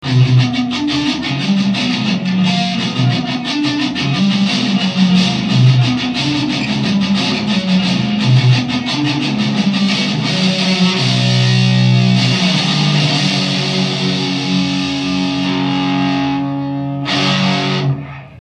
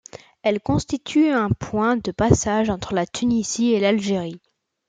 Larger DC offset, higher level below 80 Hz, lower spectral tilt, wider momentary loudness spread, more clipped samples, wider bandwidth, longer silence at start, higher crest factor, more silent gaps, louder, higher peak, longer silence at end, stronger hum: neither; about the same, -48 dBFS vs -44 dBFS; about the same, -5.5 dB/octave vs -5.5 dB/octave; about the same, 5 LU vs 6 LU; neither; about the same, 9.8 kHz vs 9.4 kHz; second, 0 s vs 0.15 s; second, 14 dB vs 20 dB; neither; first, -14 LUFS vs -21 LUFS; about the same, 0 dBFS vs -2 dBFS; second, 0 s vs 0.5 s; neither